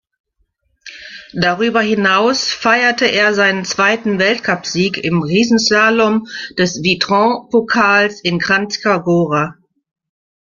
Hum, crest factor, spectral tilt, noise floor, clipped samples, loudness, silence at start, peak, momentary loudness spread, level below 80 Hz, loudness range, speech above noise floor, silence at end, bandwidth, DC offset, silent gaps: none; 14 dB; -4 dB/octave; -64 dBFS; under 0.1%; -14 LUFS; 0.85 s; 0 dBFS; 6 LU; -54 dBFS; 1 LU; 50 dB; 0.95 s; 7.4 kHz; under 0.1%; none